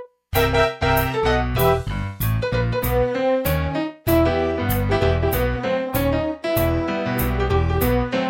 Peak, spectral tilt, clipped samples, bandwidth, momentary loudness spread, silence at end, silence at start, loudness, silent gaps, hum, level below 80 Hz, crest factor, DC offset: -4 dBFS; -6 dB/octave; under 0.1%; 17 kHz; 5 LU; 0 s; 0 s; -21 LUFS; none; none; -30 dBFS; 16 dB; under 0.1%